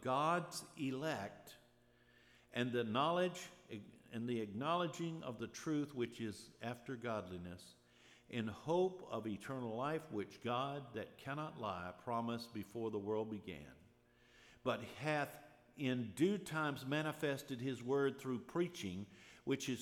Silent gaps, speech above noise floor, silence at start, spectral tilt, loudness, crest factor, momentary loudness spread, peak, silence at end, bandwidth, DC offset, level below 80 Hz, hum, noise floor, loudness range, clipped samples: none; 29 dB; 0 s; -5.5 dB/octave; -42 LUFS; 20 dB; 13 LU; -22 dBFS; 0 s; 18 kHz; under 0.1%; -78 dBFS; none; -70 dBFS; 5 LU; under 0.1%